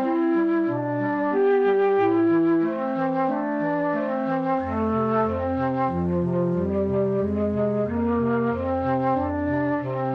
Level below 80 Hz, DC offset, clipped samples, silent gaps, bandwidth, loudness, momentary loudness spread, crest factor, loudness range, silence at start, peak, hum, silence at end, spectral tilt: -50 dBFS; under 0.1%; under 0.1%; none; 5.4 kHz; -23 LUFS; 5 LU; 10 dB; 2 LU; 0 s; -12 dBFS; none; 0 s; -10 dB/octave